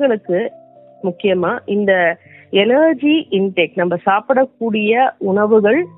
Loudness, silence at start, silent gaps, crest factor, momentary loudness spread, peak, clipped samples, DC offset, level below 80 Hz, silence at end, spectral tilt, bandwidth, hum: -15 LUFS; 0 s; none; 14 dB; 7 LU; -2 dBFS; under 0.1%; under 0.1%; -66 dBFS; 0.1 s; -10.5 dB/octave; 4 kHz; none